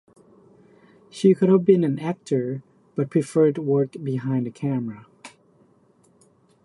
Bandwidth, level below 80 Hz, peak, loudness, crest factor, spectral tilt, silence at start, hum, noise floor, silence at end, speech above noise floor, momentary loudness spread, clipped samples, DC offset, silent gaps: 11.5 kHz; -70 dBFS; -4 dBFS; -22 LUFS; 20 dB; -8.5 dB/octave; 1.15 s; none; -59 dBFS; 1.35 s; 38 dB; 17 LU; under 0.1%; under 0.1%; none